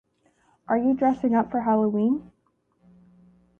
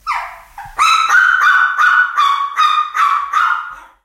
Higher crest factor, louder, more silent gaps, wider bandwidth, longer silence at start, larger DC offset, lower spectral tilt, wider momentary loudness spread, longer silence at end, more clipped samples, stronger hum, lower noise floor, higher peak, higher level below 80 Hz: about the same, 16 dB vs 14 dB; second, -23 LUFS vs -12 LUFS; neither; second, 3.4 kHz vs 16 kHz; first, 0.7 s vs 0.05 s; neither; first, -9.5 dB/octave vs 2.5 dB/octave; second, 5 LU vs 12 LU; first, 1.4 s vs 0.25 s; neither; first, 60 Hz at -45 dBFS vs none; first, -68 dBFS vs -33 dBFS; second, -10 dBFS vs 0 dBFS; second, -62 dBFS vs -52 dBFS